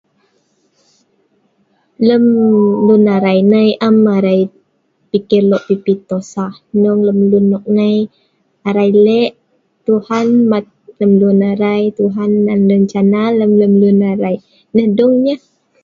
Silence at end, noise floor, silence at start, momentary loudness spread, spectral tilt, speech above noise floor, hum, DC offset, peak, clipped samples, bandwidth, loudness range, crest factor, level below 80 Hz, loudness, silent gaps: 0.45 s; -60 dBFS; 2 s; 9 LU; -8.5 dB/octave; 49 dB; none; under 0.1%; 0 dBFS; under 0.1%; 7.2 kHz; 3 LU; 12 dB; -58 dBFS; -12 LUFS; none